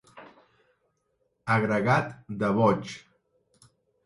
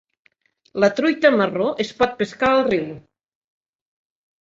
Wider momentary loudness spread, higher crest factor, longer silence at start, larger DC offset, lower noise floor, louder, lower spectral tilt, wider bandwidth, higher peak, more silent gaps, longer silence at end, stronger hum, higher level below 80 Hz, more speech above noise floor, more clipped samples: first, 17 LU vs 7 LU; about the same, 20 dB vs 20 dB; second, 0.15 s vs 0.75 s; neither; first, -74 dBFS vs -63 dBFS; second, -26 LUFS vs -19 LUFS; first, -7 dB/octave vs -5.5 dB/octave; first, 11.5 kHz vs 7.8 kHz; second, -10 dBFS vs -2 dBFS; neither; second, 1.05 s vs 1.45 s; neither; about the same, -62 dBFS vs -58 dBFS; first, 49 dB vs 44 dB; neither